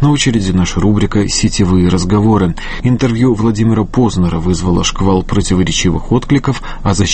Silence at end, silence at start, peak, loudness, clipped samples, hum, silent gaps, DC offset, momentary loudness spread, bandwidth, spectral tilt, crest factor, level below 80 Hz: 0 s; 0 s; 0 dBFS; -13 LUFS; under 0.1%; none; none; under 0.1%; 4 LU; 8.8 kHz; -5.5 dB/octave; 12 dB; -24 dBFS